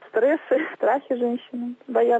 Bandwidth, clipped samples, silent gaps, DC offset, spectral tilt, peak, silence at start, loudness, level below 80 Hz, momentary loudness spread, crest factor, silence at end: 7.8 kHz; under 0.1%; none; under 0.1%; -6.5 dB/octave; -10 dBFS; 0.15 s; -24 LUFS; -80 dBFS; 9 LU; 12 dB; 0 s